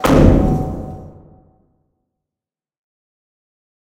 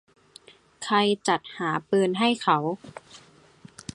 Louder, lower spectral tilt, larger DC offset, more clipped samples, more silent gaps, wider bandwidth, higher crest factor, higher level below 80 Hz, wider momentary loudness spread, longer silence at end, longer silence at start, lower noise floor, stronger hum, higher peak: first, -14 LUFS vs -24 LUFS; first, -7.5 dB/octave vs -4.5 dB/octave; neither; neither; neither; first, 16 kHz vs 11.5 kHz; about the same, 18 dB vs 20 dB; first, -26 dBFS vs -66 dBFS; first, 22 LU vs 18 LU; first, 2.9 s vs 0.8 s; second, 0 s vs 0.8 s; first, -88 dBFS vs -53 dBFS; neither; first, 0 dBFS vs -6 dBFS